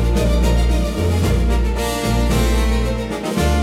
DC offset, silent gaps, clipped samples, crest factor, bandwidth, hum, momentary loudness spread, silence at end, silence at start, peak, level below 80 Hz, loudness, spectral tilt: under 0.1%; none; under 0.1%; 10 dB; 15.5 kHz; none; 3 LU; 0 s; 0 s; -6 dBFS; -18 dBFS; -18 LUFS; -6 dB/octave